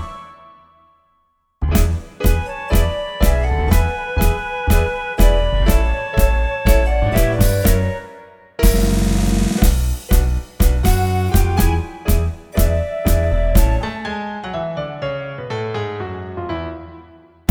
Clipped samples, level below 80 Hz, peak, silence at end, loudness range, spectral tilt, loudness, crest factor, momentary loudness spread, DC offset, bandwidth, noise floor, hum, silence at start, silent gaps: under 0.1%; -18 dBFS; 0 dBFS; 0.5 s; 5 LU; -6 dB/octave; -18 LUFS; 16 dB; 10 LU; under 0.1%; over 20 kHz; -63 dBFS; none; 0 s; none